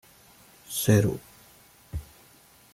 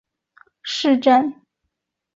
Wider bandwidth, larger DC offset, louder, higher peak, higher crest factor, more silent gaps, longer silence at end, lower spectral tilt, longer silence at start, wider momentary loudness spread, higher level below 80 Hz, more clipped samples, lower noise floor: first, 16 kHz vs 7.8 kHz; neither; second, -25 LUFS vs -18 LUFS; second, -8 dBFS vs -2 dBFS; about the same, 22 dB vs 18 dB; neither; second, 0.7 s vs 0.85 s; first, -5.5 dB/octave vs -3.5 dB/octave; about the same, 0.7 s vs 0.65 s; first, 18 LU vs 13 LU; first, -50 dBFS vs -68 dBFS; neither; second, -56 dBFS vs -78 dBFS